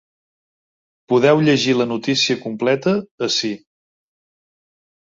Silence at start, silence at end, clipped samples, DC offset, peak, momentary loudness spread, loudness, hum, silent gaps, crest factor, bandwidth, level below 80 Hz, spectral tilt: 1.1 s; 1.45 s; under 0.1%; under 0.1%; -2 dBFS; 7 LU; -18 LUFS; none; 3.11-3.18 s; 18 dB; 7.8 kHz; -62 dBFS; -4.5 dB/octave